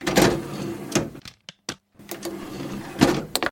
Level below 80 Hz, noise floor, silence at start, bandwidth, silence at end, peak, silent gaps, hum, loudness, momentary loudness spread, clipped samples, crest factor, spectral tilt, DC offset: -46 dBFS; -45 dBFS; 0 s; 17 kHz; 0 s; 0 dBFS; none; none; -25 LUFS; 18 LU; under 0.1%; 26 dB; -4 dB/octave; under 0.1%